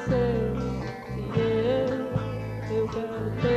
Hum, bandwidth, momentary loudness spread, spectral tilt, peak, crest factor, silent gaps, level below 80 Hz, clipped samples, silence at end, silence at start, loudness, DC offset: none; 13 kHz; 9 LU; -8 dB/octave; -12 dBFS; 14 dB; none; -42 dBFS; under 0.1%; 0 s; 0 s; -28 LUFS; under 0.1%